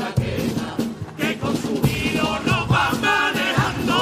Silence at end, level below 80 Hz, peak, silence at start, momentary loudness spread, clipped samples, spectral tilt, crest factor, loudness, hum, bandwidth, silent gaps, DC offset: 0 s; -42 dBFS; -6 dBFS; 0 s; 7 LU; under 0.1%; -5 dB/octave; 16 dB; -21 LUFS; none; 15.5 kHz; none; under 0.1%